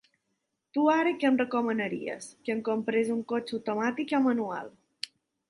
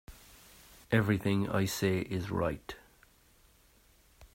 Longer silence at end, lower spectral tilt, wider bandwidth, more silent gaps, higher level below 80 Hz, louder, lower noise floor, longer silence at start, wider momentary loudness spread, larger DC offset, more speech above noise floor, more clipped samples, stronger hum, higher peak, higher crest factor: first, 0.45 s vs 0.1 s; about the same, -5 dB/octave vs -6 dB/octave; second, 11.5 kHz vs 16 kHz; neither; second, -76 dBFS vs -58 dBFS; first, -29 LUFS vs -32 LUFS; first, -80 dBFS vs -64 dBFS; first, 0.75 s vs 0.1 s; second, 15 LU vs 25 LU; neither; first, 52 dB vs 33 dB; neither; neither; about the same, -12 dBFS vs -12 dBFS; about the same, 18 dB vs 22 dB